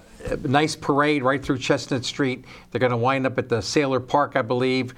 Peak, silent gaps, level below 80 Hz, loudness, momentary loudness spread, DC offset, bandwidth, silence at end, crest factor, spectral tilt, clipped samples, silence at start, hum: -4 dBFS; none; -50 dBFS; -23 LUFS; 6 LU; under 0.1%; 13.5 kHz; 0.05 s; 18 dB; -5.5 dB/octave; under 0.1%; 0.15 s; none